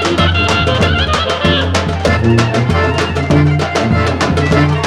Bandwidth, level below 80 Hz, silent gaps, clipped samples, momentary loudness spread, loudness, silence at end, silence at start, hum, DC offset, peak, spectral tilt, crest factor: 11.5 kHz; -26 dBFS; none; under 0.1%; 3 LU; -12 LUFS; 0 s; 0 s; none; under 0.1%; 0 dBFS; -5.5 dB/octave; 12 dB